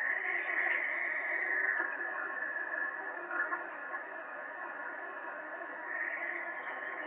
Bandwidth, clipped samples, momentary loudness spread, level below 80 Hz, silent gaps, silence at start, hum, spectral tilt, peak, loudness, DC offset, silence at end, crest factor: 3.9 kHz; under 0.1%; 11 LU; under -90 dBFS; none; 0 s; none; 0.5 dB/octave; -20 dBFS; -36 LUFS; under 0.1%; 0 s; 16 dB